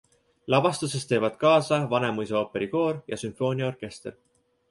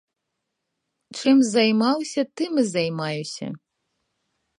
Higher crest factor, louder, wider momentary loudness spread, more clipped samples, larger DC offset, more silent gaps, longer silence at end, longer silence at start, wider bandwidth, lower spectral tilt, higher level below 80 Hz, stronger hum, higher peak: about the same, 20 dB vs 20 dB; second, -25 LUFS vs -22 LUFS; about the same, 16 LU vs 16 LU; neither; neither; neither; second, 0.6 s vs 1.05 s; second, 0.45 s vs 1.1 s; about the same, 11.5 kHz vs 11 kHz; about the same, -5.5 dB/octave vs -4.5 dB/octave; first, -64 dBFS vs -72 dBFS; neither; about the same, -6 dBFS vs -6 dBFS